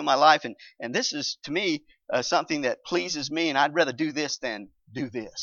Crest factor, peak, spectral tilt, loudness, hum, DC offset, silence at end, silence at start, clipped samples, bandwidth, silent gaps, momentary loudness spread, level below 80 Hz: 22 dB; -4 dBFS; -3 dB/octave; -26 LUFS; none; under 0.1%; 0 s; 0 s; under 0.1%; 7.4 kHz; none; 12 LU; -70 dBFS